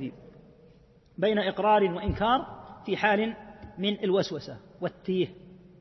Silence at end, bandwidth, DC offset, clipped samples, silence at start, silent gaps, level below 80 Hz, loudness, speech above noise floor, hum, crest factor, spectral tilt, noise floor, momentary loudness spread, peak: 0.25 s; 6.2 kHz; under 0.1%; under 0.1%; 0 s; none; -50 dBFS; -28 LUFS; 30 dB; none; 20 dB; -6.5 dB/octave; -57 dBFS; 18 LU; -10 dBFS